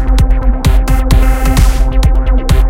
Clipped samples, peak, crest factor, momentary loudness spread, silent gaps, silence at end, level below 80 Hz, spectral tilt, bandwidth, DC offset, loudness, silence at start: 0.7%; 0 dBFS; 8 dB; 2 LU; none; 0 s; -8 dBFS; -6 dB/octave; 16 kHz; under 0.1%; -12 LUFS; 0 s